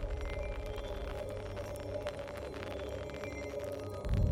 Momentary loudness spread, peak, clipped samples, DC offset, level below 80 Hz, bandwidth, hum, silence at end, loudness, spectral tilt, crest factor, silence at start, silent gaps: 2 LU; -20 dBFS; under 0.1%; under 0.1%; -42 dBFS; 16 kHz; none; 0 s; -41 LUFS; -6.5 dB/octave; 18 dB; 0 s; none